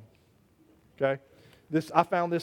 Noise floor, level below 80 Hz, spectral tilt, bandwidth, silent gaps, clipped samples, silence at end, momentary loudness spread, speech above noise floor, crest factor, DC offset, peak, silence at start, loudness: -63 dBFS; -72 dBFS; -7 dB/octave; 16.5 kHz; none; under 0.1%; 0 s; 6 LU; 36 dB; 24 dB; under 0.1%; -6 dBFS; 1 s; -29 LUFS